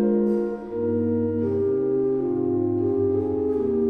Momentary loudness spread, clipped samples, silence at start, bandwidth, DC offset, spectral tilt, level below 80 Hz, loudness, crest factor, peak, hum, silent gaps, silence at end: 3 LU; under 0.1%; 0 s; 3.1 kHz; under 0.1%; -12 dB/octave; -54 dBFS; -24 LUFS; 12 dB; -10 dBFS; none; none; 0 s